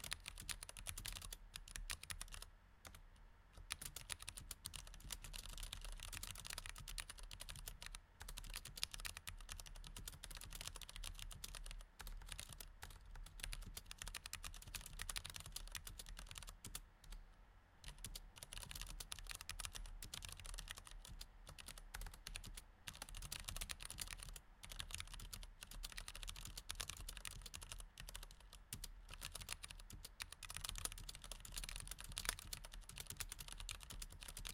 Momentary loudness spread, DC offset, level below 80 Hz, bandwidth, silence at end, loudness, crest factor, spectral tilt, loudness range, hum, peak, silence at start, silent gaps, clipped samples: 9 LU; under 0.1%; -56 dBFS; 17 kHz; 0 s; -52 LUFS; 36 dB; -1 dB/octave; 4 LU; none; -18 dBFS; 0 s; none; under 0.1%